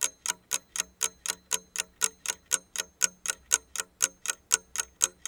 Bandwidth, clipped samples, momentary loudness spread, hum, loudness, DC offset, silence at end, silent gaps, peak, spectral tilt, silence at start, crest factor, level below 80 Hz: 19.5 kHz; under 0.1%; 7 LU; none; -30 LUFS; under 0.1%; 0.15 s; none; -2 dBFS; 2 dB/octave; 0 s; 32 dB; -66 dBFS